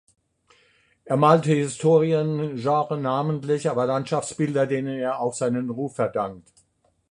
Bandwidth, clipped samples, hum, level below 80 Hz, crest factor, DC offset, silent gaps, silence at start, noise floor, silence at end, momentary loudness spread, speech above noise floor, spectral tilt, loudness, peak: 11 kHz; under 0.1%; none; -64 dBFS; 20 dB; under 0.1%; none; 1.05 s; -66 dBFS; 0.7 s; 9 LU; 43 dB; -6.5 dB/octave; -23 LUFS; -2 dBFS